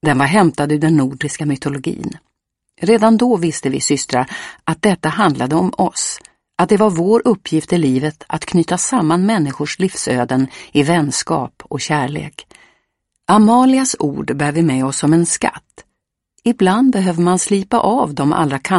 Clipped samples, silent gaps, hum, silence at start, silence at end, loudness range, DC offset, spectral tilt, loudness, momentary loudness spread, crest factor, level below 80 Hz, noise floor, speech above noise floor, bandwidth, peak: under 0.1%; none; none; 0.05 s; 0 s; 2 LU; under 0.1%; -5 dB/octave; -15 LUFS; 10 LU; 16 dB; -52 dBFS; -74 dBFS; 59 dB; 11.5 kHz; 0 dBFS